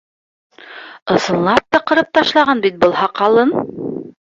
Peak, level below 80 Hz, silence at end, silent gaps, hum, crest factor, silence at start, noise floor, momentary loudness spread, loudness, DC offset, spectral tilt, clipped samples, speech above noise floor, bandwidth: 0 dBFS; -54 dBFS; 0.2 s; 1.02-1.06 s; none; 16 dB; 0.65 s; -36 dBFS; 15 LU; -14 LUFS; under 0.1%; -5 dB/octave; under 0.1%; 22 dB; 8 kHz